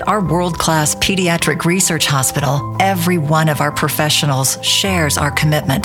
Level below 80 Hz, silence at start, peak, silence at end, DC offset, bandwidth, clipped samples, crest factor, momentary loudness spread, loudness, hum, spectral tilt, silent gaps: -38 dBFS; 0 s; -2 dBFS; 0 s; under 0.1%; 18 kHz; under 0.1%; 14 dB; 3 LU; -14 LUFS; none; -3.5 dB/octave; none